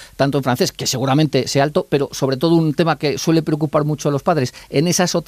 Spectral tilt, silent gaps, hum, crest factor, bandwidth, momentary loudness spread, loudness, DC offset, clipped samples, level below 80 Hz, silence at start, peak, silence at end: -5 dB/octave; none; none; 14 dB; 15.5 kHz; 4 LU; -18 LUFS; under 0.1%; under 0.1%; -50 dBFS; 0 s; -4 dBFS; 0.05 s